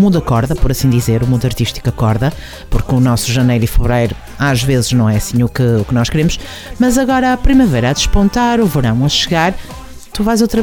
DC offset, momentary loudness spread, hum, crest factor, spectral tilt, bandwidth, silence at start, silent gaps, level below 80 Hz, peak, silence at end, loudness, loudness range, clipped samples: under 0.1%; 7 LU; none; 12 dB; -5.5 dB/octave; 19 kHz; 0 s; none; -22 dBFS; -2 dBFS; 0 s; -13 LUFS; 2 LU; under 0.1%